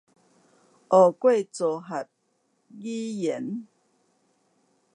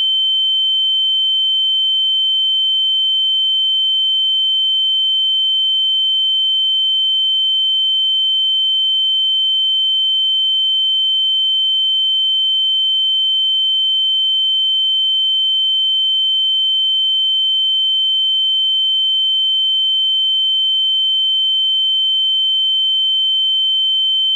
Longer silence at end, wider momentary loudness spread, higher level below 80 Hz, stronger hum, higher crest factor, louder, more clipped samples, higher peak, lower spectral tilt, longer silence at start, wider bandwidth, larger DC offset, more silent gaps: first, 1.3 s vs 0 s; first, 17 LU vs 0 LU; first, -84 dBFS vs under -90 dBFS; neither; first, 22 dB vs 4 dB; second, -24 LUFS vs -12 LUFS; neither; first, -6 dBFS vs -12 dBFS; first, -6 dB/octave vs 10 dB/octave; first, 0.9 s vs 0 s; first, 10.5 kHz vs 7.4 kHz; neither; neither